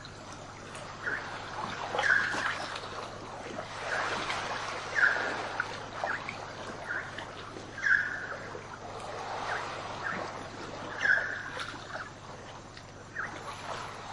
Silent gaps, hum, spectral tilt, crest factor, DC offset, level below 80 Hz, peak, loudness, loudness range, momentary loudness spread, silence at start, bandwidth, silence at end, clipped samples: none; 50 Hz at -65 dBFS; -3 dB/octave; 22 dB; under 0.1%; -60 dBFS; -12 dBFS; -33 LUFS; 2 LU; 16 LU; 0 s; 11.5 kHz; 0 s; under 0.1%